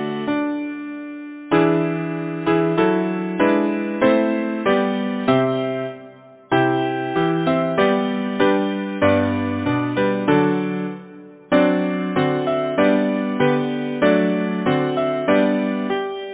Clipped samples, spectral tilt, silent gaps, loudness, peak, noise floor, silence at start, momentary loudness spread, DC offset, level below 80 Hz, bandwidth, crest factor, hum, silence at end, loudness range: under 0.1%; -10.5 dB/octave; none; -20 LUFS; -4 dBFS; -43 dBFS; 0 s; 8 LU; under 0.1%; -52 dBFS; 4 kHz; 16 dB; none; 0 s; 2 LU